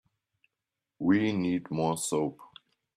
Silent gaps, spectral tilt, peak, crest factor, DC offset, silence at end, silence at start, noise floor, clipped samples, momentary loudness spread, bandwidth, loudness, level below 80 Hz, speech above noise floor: none; -5.5 dB/octave; -14 dBFS; 18 dB; under 0.1%; 0.5 s; 1 s; -88 dBFS; under 0.1%; 6 LU; 14 kHz; -29 LUFS; -68 dBFS; 60 dB